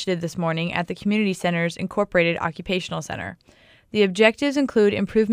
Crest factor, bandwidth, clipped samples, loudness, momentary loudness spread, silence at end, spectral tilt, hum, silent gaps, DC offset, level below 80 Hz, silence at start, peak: 20 dB; 13.5 kHz; under 0.1%; -22 LUFS; 11 LU; 0 s; -5.5 dB/octave; none; none; under 0.1%; -54 dBFS; 0 s; -2 dBFS